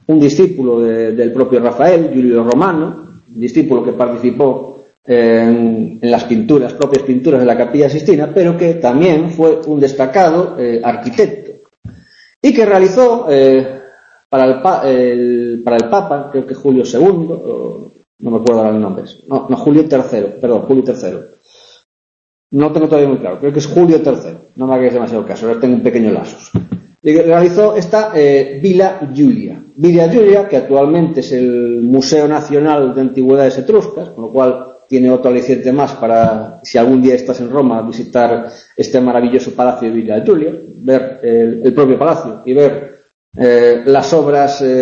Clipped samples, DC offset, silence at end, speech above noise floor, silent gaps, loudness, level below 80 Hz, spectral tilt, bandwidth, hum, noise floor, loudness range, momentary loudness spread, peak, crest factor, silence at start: under 0.1%; under 0.1%; 0 s; 25 dB; 4.97-5.03 s, 11.77-11.83 s, 12.36-12.41 s, 14.25-14.30 s, 18.07-18.19 s, 21.85-22.50 s, 43.14-43.32 s; -12 LUFS; -52 dBFS; -7 dB/octave; 7.6 kHz; none; -36 dBFS; 3 LU; 10 LU; 0 dBFS; 12 dB; 0.1 s